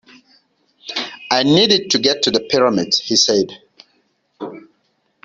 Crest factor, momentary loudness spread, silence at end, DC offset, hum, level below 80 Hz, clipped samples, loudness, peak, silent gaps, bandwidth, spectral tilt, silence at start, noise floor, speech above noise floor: 18 dB; 20 LU; 0.65 s; under 0.1%; none; -58 dBFS; under 0.1%; -15 LUFS; -2 dBFS; none; 7.8 kHz; -3 dB/octave; 0.85 s; -65 dBFS; 49 dB